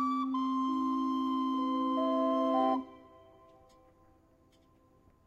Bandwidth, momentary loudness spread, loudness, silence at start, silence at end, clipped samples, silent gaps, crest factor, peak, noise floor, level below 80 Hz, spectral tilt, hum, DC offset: 6.6 kHz; 3 LU; -31 LUFS; 0 s; 2.25 s; under 0.1%; none; 14 dB; -18 dBFS; -65 dBFS; -72 dBFS; -6 dB/octave; none; under 0.1%